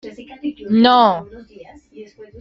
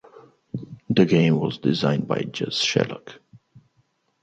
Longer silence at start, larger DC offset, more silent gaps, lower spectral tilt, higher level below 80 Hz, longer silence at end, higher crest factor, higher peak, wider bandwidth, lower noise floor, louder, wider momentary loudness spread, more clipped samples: about the same, 0.05 s vs 0.15 s; neither; neither; first, -7 dB/octave vs -5.5 dB/octave; first, -54 dBFS vs -62 dBFS; second, 0.15 s vs 0.85 s; about the same, 16 dB vs 20 dB; about the same, -2 dBFS vs -4 dBFS; second, 6.2 kHz vs 8.8 kHz; second, -41 dBFS vs -67 dBFS; first, -14 LUFS vs -22 LUFS; about the same, 17 LU vs 18 LU; neither